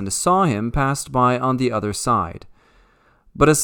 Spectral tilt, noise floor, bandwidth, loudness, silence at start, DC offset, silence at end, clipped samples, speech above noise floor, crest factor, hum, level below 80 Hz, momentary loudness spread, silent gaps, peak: -5 dB/octave; -56 dBFS; 19 kHz; -19 LUFS; 0 s; under 0.1%; 0 s; under 0.1%; 37 dB; 20 dB; none; -38 dBFS; 5 LU; none; 0 dBFS